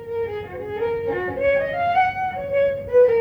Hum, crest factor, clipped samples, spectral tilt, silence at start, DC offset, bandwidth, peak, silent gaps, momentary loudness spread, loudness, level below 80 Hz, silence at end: none; 14 dB; under 0.1%; -7 dB/octave; 0 s; under 0.1%; 5.4 kHz; -6 dBFS; none; 10 LU; -22 LUFS; -48 dBFS; 0 s